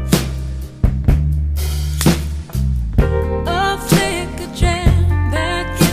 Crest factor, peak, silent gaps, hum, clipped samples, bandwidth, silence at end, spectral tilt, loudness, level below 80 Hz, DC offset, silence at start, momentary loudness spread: 16 dB; 0 dBFS; none; none; under 0.1%; 15.5 kHz; 0 s; -5.5 dB/octave; -18 LUFS; -20 dBFS; under 0.1%; 0 s; 7 LU